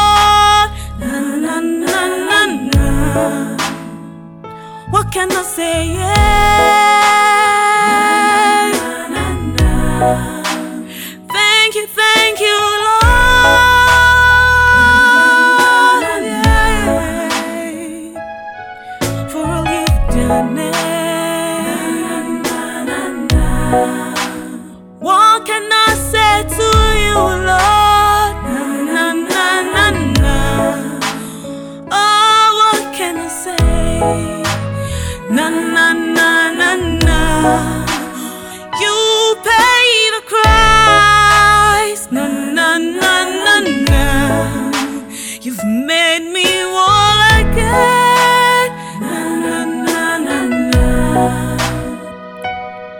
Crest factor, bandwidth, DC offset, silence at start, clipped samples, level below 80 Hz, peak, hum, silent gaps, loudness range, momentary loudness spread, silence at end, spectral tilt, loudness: 12 dB; 19 kHz; under 0.1%; 0 s; under 0.1%; -22 dBFS; 0 dBFS; none; none; 8 LU; 14 LU; 0 s; -3.5 dB/octave; -12 LUFS